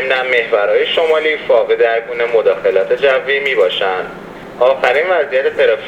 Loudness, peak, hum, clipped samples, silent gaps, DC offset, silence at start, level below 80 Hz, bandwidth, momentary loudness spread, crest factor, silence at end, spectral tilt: -13 LUFS; 0 dBFS; none; under 0.1%; none; under 0.1%; 0 s; -52 dBFS; 8.8 kHz; 4 LU; 14 dB; 0 s; -4 dB/octave